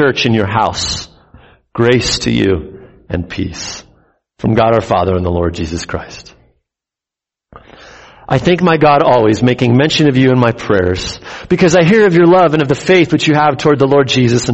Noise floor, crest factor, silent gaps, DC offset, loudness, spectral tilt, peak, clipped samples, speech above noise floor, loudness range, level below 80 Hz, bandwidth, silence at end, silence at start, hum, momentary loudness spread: -86 dBFS; 12 dB; none; under 0.1%; -12 LUFS; -5.5 dB/octave; 0 dBFS; under 0.1%; 75 dB; 8 LU; -36 dBFS; 8.4 kHz; 0 s; 0 s; none; 14 LU